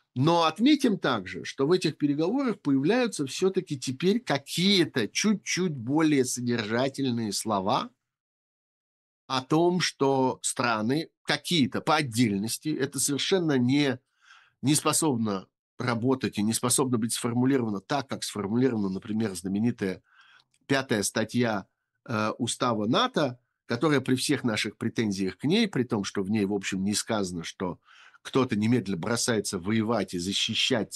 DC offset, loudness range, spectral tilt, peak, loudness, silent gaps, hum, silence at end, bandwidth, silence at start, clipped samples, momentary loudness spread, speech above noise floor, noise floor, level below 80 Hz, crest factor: under 0.1%; 3 LU; -4.5 dB/octave; -8 dBFS; -27 LUFS; 8.20-9.28 s, 11.17-11.25 s, 15.59-15.77 s; none; 0 s; 12.5 kHz; 0.15 s; under 0.1%; 7 LU; 33 dB; -60 dBFS; -70 dBFS; 20 dB